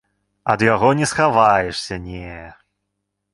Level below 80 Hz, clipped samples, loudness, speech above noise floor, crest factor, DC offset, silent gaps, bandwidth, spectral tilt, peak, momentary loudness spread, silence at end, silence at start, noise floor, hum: -46 dBFS; under 0.1%; -17 LUFS; 59 dB; 18 dB; under 0.1%; none; 11.5 kHz; -5 dB/octave; 0 dBFS; 18 LU; 0.8 s; 0.45 s; -76 dBFS; 50 Hz at -50 dBFS